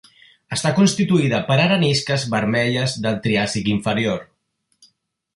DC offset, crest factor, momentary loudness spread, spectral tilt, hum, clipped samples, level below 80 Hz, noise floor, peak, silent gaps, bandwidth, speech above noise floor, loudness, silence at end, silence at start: under 0.1%; 16 dB; 6 LU; -5 dB/octave; none; under 0.1%; -52 dBFS; -70 dBFS; -4 dBFS; none; 11.5 kHz; 51 dB; -19 LUFS; 1.15 s; 0.5 s